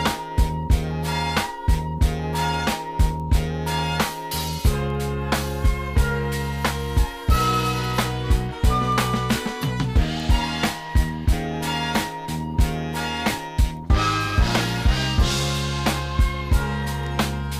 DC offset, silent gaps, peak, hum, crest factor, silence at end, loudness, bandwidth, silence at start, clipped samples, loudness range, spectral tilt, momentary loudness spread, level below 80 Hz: under 0.1%; none; -6 dBFS; none; 16 dB; 0 s; -23 LUFS; 16 kHz; 0 s; under 0.1%; 2 LU; -5 dB/octave; 4 LU; -26 dBFS